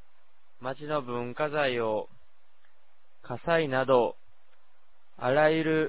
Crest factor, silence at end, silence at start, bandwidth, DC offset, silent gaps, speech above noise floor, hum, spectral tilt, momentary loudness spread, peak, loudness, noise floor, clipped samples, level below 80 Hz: 20 dB; 0 s; 0.6 s; 4 kHz; 0.8%; none; 43 dB; none; -9.5 dB/octave; 14 LU; -10 dBFS; -28 LUFS; -70 dBFS; under 0.1%; -66 dBFS